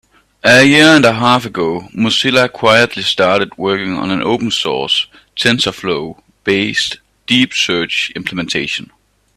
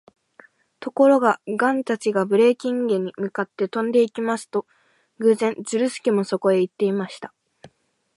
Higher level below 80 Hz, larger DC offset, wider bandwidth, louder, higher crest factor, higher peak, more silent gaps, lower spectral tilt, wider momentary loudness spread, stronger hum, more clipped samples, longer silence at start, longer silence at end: first, -50 dBFS vs -76 dBFS; neither; first, 15 kHz vs 11.5 kHz; first, -13 LUFS vs -21 LUFS; about the same, 14 dB vs 18 dB; first, 0 dBFS vs -4 dBFS; neither; second, -4 dB/octave vs -5.5 dB/octave; about the same, 12 LU vs 11 LU; neither; neither; second, 0.45 s vs 0.8 s; about the same, 0.55 s vs 0.5 s